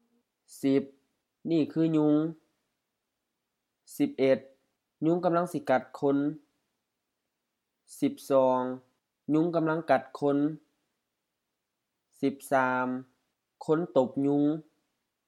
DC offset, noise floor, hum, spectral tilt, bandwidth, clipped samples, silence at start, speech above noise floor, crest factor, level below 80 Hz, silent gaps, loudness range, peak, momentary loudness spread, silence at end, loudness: under 0.1%; -84 dBFS; none; -7 dB/octave; 14.5 kHz; under 0.1%; 0.5 s; 57 dB; 20 dB; -84 dBFS; none; 3 LU; -10 dBFS; 12 LU; 0.65 s; -28 LUFS